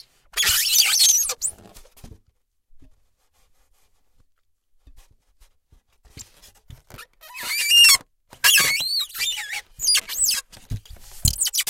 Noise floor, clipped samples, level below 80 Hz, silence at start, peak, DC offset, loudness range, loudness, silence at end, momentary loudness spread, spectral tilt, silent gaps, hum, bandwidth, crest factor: -66 dBFS; under 0.1%; -44 dBFS; 0.35 s; -2 dBFS; under 0.1%; 12 LU; -17 LUFS; 0.05 s; 19 LU; 1.5 dB/octave; none; none; 17 kHz; 22 dB